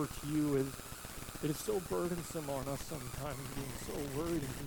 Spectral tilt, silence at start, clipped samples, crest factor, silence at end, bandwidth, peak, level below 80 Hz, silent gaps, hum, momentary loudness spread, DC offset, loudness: -5 dB/octave; 0 s; under 0.1%; 16 dB; 0 s; 19 kHz; -24 dBFS; -54 dBFS; none; none; 8 LU; under 0.1%; -39 LUFS